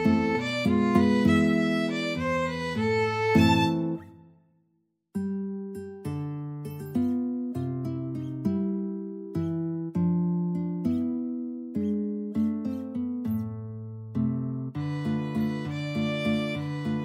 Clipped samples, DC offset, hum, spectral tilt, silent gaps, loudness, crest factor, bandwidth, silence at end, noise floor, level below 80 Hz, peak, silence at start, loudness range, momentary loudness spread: under 0.1%; under 0.1%; none; -7 dB/octave; none; -28 LUFS; 20 dB; 15.5 kHz; 0 s; -73 dBFS; -58 dBFS; -8 dBFS; 0 s; 8 LU; 12 LU